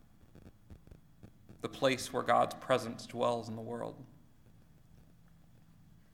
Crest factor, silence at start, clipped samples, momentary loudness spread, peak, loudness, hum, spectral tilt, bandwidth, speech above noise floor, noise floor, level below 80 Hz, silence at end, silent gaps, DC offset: 24 dB; 0.35 s; under 0.1%; 24 LU; -14 dBFS; -34 LUFS; none; -4.5 dB/octave; 19 kHz; 26 dB; -60 dBFS; -66 dBFS; 2.05 s; none; under 0.1%